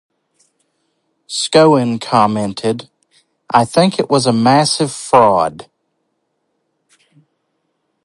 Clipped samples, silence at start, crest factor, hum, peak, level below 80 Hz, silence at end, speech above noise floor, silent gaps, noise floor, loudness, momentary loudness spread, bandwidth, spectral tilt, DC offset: under 0.1%; 1.3 s; 16 dB; none; 0 dBFS; -58 dBFS; 2.45 s; 56 dB; none; -68 dBFS; -14 LUFS; 10 LU; 11.5 kHz; -5 dB/octave; under 0.1%